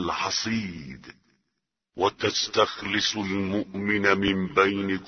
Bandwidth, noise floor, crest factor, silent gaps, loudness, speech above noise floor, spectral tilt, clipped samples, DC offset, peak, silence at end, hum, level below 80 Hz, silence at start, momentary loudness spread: 6.6 kHz; -81 dBFS; 22 dB; none; -25 LUFS; 56 dB; -4 dB/octave; under 0.1%; under 0.1%; -4 dBFS; 0 s; none; -56 dBFS; 0 s; 14 LU